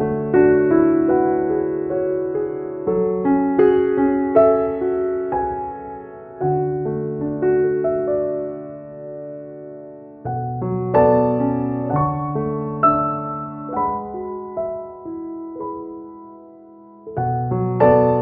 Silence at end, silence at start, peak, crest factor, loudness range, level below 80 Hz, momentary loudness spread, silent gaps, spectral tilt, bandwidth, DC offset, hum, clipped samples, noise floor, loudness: 0 s; 0 s; -2 dBFS; 18 dB; 9 LU; -48 dBFS; 18 LU; none; -9.5 dB/octave; 3.1 kHz; under 0.1%; none; under 0.1%; -43 dBFS; -19 LUFS